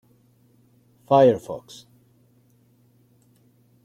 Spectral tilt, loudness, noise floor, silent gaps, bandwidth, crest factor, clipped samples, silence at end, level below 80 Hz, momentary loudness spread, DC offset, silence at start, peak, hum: -7 dB/octave; -19 LUFS; -60 dBFS; none; 13 kHz; 22 dB; under 0.1%; 2.25 s; -68 dBFS; 28 LU; under 0.1%; 1.1 s; -4 dBFS; none